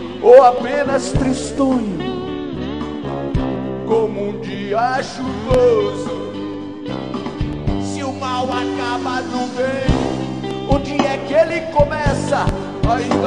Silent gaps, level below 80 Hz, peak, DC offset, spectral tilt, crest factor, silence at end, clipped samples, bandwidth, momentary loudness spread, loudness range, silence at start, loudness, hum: none; -32 dBFS; 0 dBFS; 0.5%; -6 dB/octave; 18 dB; 0 s; under 0.1%; 10 kHz; 11 LU; 4 LU; 0 s; -18 LUFS; none